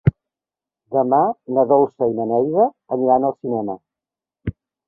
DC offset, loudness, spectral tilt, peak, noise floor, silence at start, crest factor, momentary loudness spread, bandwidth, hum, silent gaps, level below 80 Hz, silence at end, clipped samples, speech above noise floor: under 0.1%; -19 LUFS; -12.5 dB/octave; -2 dBFS; -89 dBFS; 0.05 s; 18 dB; 15 LU; 3.3 kHz; none; none; -46 dBFS; 0.35 s; under 0.1%; 71 dB